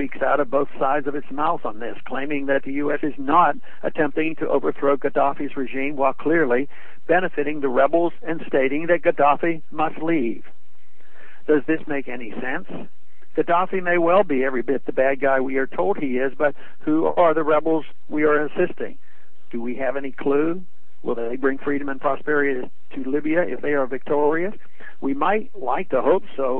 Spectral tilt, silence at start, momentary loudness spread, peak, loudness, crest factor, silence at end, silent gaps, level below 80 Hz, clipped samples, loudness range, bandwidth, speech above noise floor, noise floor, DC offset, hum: -9.5 dB/octave; 0 s; 12 LU; -4 dBFS; -22 LUFS; 18 dB; 0 s; none; -62 dBFS; under 0.1%; 4 LU; 4.1 kHz; 39 dB; -61 dBFS; 7%; none